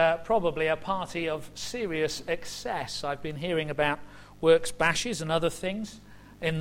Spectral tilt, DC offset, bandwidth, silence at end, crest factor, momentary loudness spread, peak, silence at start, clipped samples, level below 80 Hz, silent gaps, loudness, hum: -4 dB/octave; under 0.1%; 16 kHz; 0 s; 20 dB; 10 LU; -10 dBFS; 0 s; under 0.1%; -52 dBFS; none; -29 LUFS; 50 Hz at -55 dBFS